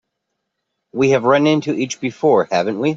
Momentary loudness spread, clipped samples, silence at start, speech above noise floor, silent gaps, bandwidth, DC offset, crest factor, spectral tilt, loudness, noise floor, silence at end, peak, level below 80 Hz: 8 LU; under 0.1%; 0.95 s; 60 dB; none; 7.8 kHz; under 0.1%; 14 dB; -5.5 dB/octave; -16 LUFS; -76 dBFS; 0 s; -2 dBFS; -60 dBFS